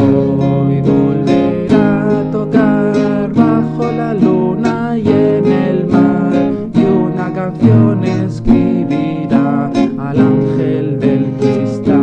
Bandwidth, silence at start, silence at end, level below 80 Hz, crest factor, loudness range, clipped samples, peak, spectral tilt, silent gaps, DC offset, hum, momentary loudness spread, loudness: 8.4 kHz; 0 s; 0 s; -38 dBFS; 12 dB; 1 LU; under 0.1%; 0 dBFS; -9 dB/octave; none; under 0.1%; none; 4 LU; -13 LUFS